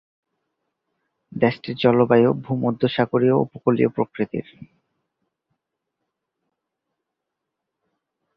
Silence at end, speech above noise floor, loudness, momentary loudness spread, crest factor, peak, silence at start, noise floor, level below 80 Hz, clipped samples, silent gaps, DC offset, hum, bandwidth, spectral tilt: 3.7 s; 62 dB; -20 LUFS; 10 LU; 22 dB; -2 dBFS; 1.35 s; -82 dBFS; -62 dBFS; under 0.1%; none; under 0.1%; none; 5.6 kHz; -10 dB/octave